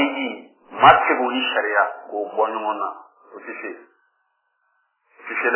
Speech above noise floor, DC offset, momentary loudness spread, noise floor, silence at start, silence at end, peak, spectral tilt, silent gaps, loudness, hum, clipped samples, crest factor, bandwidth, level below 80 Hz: 50 dB; under 0.1%; 24 LU; -70 dBFS; 0 s; 0 s; 0 dBFS; -7.5 dB/octave; none; -19 LUFS; none; under 0.1%; 22 dB; 4 kHz; -56 dBFS